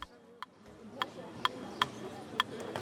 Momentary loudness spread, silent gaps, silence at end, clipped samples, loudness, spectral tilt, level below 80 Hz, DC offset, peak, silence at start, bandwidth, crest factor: 15 LU; none; 0 s; under 0.1%; -37 LUFS; -3 dB/octave; -70 dBFS; under 0.1%; -8 dBFS; 0 s; 19 kHz; 32 dB